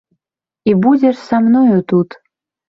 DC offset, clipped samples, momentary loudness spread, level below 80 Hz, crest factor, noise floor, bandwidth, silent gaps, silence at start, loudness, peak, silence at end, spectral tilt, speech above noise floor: under 0.1%; under 0.1%; 7 LU; -58 dBFS; 12 dB; -80 dBFS; 6.8 kHz; none; 0.65 s; -13 LUFS; -2 dBFS; 0.65 s; -9 dB/octave; 69 dB